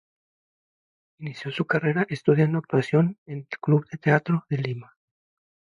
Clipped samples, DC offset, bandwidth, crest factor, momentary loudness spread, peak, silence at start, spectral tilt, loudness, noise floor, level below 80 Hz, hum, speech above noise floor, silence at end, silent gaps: under 0.1%; under 0.1%; 7.2 kHz; 20 dB; 14 LU; -6 dBFS; 1.2 s; -8.5 dB/octave; -24 LUFS; under -90 dBFS; -68 dBFS; none; over 66 dB; 0.9 s; 3.18-3.26 s